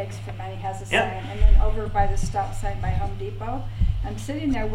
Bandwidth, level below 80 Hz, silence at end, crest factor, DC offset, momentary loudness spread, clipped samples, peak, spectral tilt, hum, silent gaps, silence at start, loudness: 11.5 kHz; -24 dBFS; 0 s; 18 dB; under 0.1%; 10 LU; under 0.1%; -4 dBFS; -6 dB/octave; none; none; 0 s; -26 LUFS